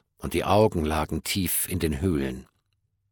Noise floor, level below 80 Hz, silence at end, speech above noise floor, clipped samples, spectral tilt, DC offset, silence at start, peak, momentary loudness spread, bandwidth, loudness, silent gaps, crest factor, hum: -74 dBFS; -40 dBFS; 0.7 s; 49 dB; under 0.1%; -5 dB/octave; under 0.1%; 0.2 s; -8 dBFS; 9 LU; 18 kHz; -25 LUFS; none; 18 dB; none